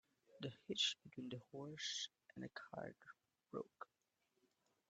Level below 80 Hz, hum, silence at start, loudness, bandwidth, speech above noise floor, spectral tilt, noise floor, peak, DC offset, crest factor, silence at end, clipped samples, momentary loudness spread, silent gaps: -88 dBFS; none; 0.3 s; -47 LUFS; 9 kHz; 35 dB; -2.5 dB/octave; -84 dBFS; -28 dBFS; under 0.1%; 24 dB; 1.05 s; under 0.1%; 18 LU; none